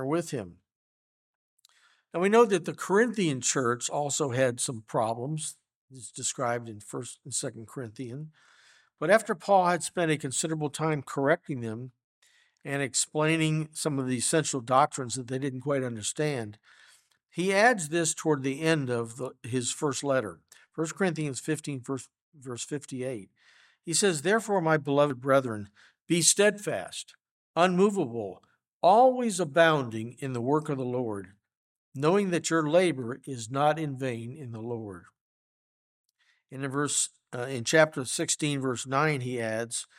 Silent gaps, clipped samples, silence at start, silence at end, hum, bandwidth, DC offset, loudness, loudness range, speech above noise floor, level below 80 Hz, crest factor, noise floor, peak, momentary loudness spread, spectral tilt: 0.75-1.57 s, 5.75-5.88 s, 12.04-12.22 s, 22.21-22.32 s, 27.31-27.54 s, 28.68-28.81 s, 31.57-31.92 s, 35.21-36.09 s; under 0.1%; 0 s; 0.15 s; none; 16 kHz; under 0.1%; -28 LUFS; 8 LU; 37 dB; -76 dBFS; 22 dB; -64 dBFS; -6 dBFS; 16 LU; -4 dB/octave